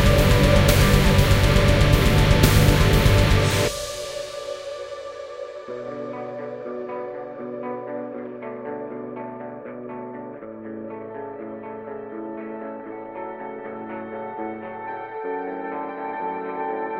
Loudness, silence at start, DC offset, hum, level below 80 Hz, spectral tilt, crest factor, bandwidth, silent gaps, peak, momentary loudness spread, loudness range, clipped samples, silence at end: -22 LUFS; 0 s; under 0.1%; none; -28 dBFS; -5.5 dB/octave; 22 dB; 16 kHz; none; 0 dBFS; 18 LU; 17 LU; under 0.1%; 0 s